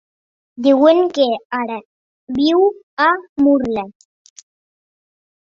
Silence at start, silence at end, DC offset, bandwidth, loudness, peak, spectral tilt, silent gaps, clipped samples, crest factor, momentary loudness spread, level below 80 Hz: 0.6 s; 1.5 s; under 0.1%; 7.4 kHz; -16 LUFS; -2 dBFS; -5 dB/octave; 1.45-1.50 s, 1.85-2.27 s, 2.83-2.97 s, 3.29-3.36 s; under 0.1%; 16 dB; 14 LU; -56 dBFS